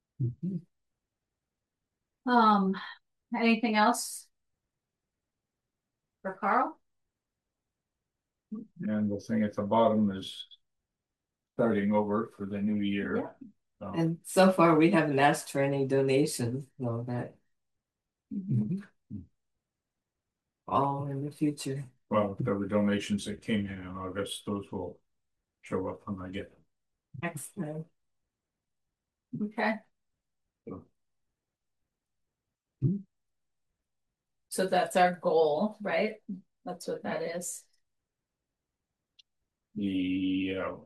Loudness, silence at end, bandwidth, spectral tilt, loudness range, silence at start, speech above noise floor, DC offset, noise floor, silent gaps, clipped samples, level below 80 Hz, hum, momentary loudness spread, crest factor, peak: -30 LUFS; 0 s; 12.5 kHz; -5.5 dB/octave; 13 LU; 0.2 s; over 61 dB; under 0.1%; under -90 dBFS; none; under 0.1%; -72 dBFS; none; 18 LU; 22 dB; -10 dBFS